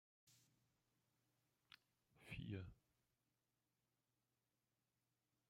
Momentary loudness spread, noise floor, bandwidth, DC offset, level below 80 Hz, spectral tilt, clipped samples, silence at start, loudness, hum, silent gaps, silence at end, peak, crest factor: 17 LU; under -90 dBFS; 16 kHz; under 0.1%; -78 dBFS; -6.5 dB/octave; under 0.1%; 0.25 s; -55 LUFS; none; none; 2.75 s; -38 dBFS; 24 dB